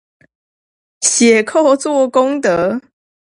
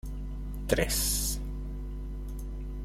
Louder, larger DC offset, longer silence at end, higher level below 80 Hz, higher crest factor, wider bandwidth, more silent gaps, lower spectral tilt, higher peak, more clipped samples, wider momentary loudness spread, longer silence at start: first, -13 LUFS vs -32 LUFS; neither; first, 0.45 s vs 0 s; second, -58 dBFS vs -36 dBFS; second, 14 dB vs 22 dB; second, 11.5 kHz vs 16 kHz; neither; about the same, -3 dB/octave vs -3.5 dB/octave; first, 0 dBFS vs -10 dBFS; neither; second, 6 LU vs 13 LU; first, 1 s vs 0.05 s